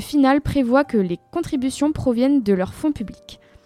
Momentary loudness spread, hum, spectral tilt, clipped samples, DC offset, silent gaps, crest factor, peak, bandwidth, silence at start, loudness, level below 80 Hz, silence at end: 8 LU; none; -6.5 dB/octave; under 0.1%; under 0.1%; none; 16 dB; -2 dBFS; 14.5 kHz; 0 s; -20 LUFS; -42 dBFS; 0.3 s